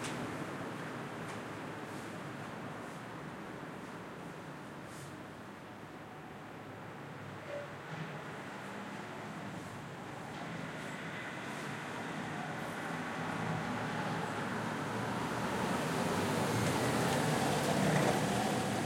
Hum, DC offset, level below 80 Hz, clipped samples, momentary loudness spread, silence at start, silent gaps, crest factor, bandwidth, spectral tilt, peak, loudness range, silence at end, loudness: none; under 0.1%; -68 dBFS; under 0.1%; 15 LU; 0 s; none; 20 dB; 16.5 kHz; -5 dB/octave; -18 dBFS; 14 LU; 0 s; -38 LUFS